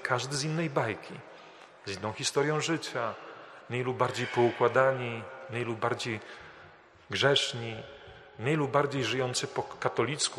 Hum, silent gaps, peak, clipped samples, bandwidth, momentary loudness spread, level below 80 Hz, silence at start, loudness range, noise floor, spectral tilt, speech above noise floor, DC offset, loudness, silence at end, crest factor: none; none; -10 dBFS; under 0.1%; 13 kHz; 21 LU; -70 dBFS; 0 s; 3 LU; -55 dBFS; -4 dB/octave; 25 dB; under 0.1%; -30 LUFS; 0 s; 22 dB